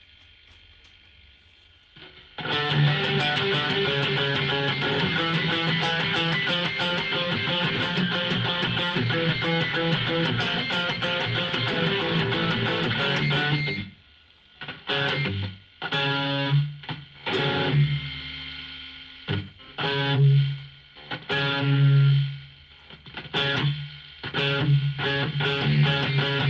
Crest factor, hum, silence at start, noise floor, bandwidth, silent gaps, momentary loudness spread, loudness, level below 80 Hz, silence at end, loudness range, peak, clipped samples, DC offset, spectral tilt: 16 dB; none; 1.95 s; -56 dBFS; 7.2 kHz; none; 14 LU; -24 LUFS; -56 dBFS; 0 s; 4 LU; -10 dBFS; under 0.1%; under 0.1%; -6.5 dB/octave